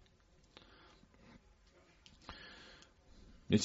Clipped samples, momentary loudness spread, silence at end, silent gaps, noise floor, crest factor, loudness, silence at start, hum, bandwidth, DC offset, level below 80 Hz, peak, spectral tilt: under 0.1%; 14 LU; 0 s; none; -68 dBFS; 26 dB; -45 LUFS; 2.3 s; none; 7.6 kHz; under 0.1%; -66 dBFS; -18 dBFS; -5.5 dB/octave